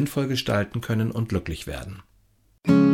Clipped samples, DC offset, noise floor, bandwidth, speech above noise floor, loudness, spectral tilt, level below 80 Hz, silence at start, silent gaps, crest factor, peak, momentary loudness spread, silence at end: under 0.1%; under 0.1%; -61 dBFS; 16.5 kHz; 38 dB; -25 LUFS; -6.5 dB/octave; -46 dBFS; 0 s; none; 18 dB; -6 dBFS; 14 LU; 0 s